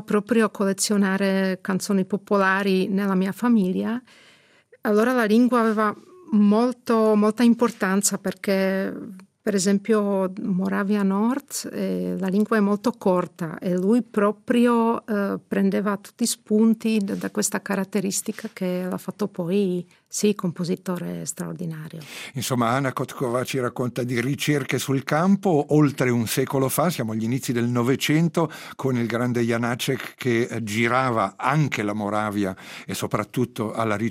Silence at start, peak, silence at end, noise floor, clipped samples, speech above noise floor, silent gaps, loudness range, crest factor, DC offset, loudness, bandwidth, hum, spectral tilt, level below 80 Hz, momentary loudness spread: 0 s; -4 dBFS; 0 s; -56 dBFS; under 0.1%; 33 dB; none; 5 LU; 18 dB; under 0.1%; -23 LUFS; 16 kHz; none; -5.5 dB/octave; -66 dBFS; 10 LU